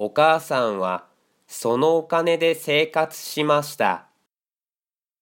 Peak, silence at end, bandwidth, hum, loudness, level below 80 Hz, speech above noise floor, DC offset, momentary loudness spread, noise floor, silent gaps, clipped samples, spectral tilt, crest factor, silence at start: -4 dBFS; 1.2 s; 17 kHz; none; -21 LUFS; -76 dBFS; over 69 dB; under 0.1%; 9 LU; under -90 dBFS; none; under 0.1%; -4 dB/octave; 18 dB; 0 s